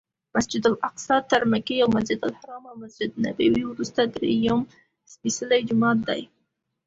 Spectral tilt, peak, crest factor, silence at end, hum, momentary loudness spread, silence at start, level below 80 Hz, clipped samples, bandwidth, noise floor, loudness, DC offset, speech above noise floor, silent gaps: -4.5 dB/octave; -6 dBFS; 18 dB; 0.65 s; none; 10 LU; 0.35 s; -56 dBFS; under 0.1%; 8 kHz; -75 dBFS; -24 LUFS; under 0.1%; 52 dB; none